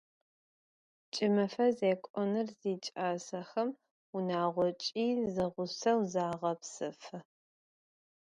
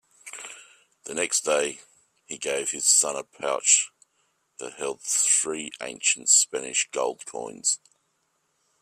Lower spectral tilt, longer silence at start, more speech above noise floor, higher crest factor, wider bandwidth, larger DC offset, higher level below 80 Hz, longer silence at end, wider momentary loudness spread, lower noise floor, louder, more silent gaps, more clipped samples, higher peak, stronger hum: first, -5.5 dB/octave vs 1 dB/octave; first, 1.15 s vs 0.25 s; first, over 57 dB vs 47 dB; about the same, 18 dB vs 22 dB; second, 10.5 kHz vs 15.5 kHz; neither; about the same, -74 dBFS vs -76 dBFS; about the same, 1.1 s vs 1.05 s; second, 11 LU vs 20 LU; first, under -90 dBFS vs -73 dBFS; second, -34 LUFS vs -23 LUFS; first, 2.10-2.14 s, 3.91-4.13 s vs none; neither; second, -16 dBFS vs -4 dBFS; neither